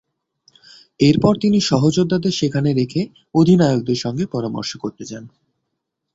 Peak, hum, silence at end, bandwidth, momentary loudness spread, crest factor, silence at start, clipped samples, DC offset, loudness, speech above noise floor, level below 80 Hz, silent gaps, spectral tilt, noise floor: -2 dBFS; none; 0.85 s; 8 kHz; 14 LU; 16 dB; 1 s; under 0.1%; under 0.1%; -17 LUFS; 60 dB; -50 dBFS; none; -6.5 dB/octave; -77 dBFS